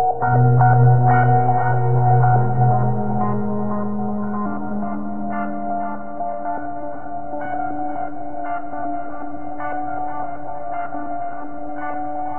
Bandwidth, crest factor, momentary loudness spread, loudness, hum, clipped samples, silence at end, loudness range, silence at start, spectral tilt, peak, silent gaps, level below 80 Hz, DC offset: 2.9 kHz; 16 dB; 15 LU; -21 LUFS; none; under 0.1%; 0 s; 11 LU; 0 s; -10.5 dB/octave; -4 dBFS; none; -46 dBFS; 6%